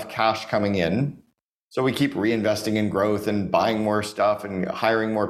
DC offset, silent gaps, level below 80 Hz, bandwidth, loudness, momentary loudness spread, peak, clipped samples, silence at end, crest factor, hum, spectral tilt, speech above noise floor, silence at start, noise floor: under 0.1%; 1.42-1.71 s; -56 dBFS; 15 kHz; -23 LUFS; 4 LU; -4 dBFS; under 0.1%; 0 s; 20 dB; none; -6 dB/octave; 45 dB; 0 s; -68 dBFS